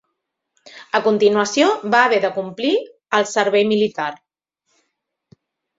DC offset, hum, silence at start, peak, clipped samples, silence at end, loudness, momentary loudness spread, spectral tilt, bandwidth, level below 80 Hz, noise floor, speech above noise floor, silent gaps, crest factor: under 0.1%; none; 0.75 s; -2 dBFS; under 0.1%; 1.65 s; -18 LUFS; 8 LU; -3.5 dB/octave; 7.8 kHz; -68 dBFS; -76 dBFS; 59 dB; none; 18 dB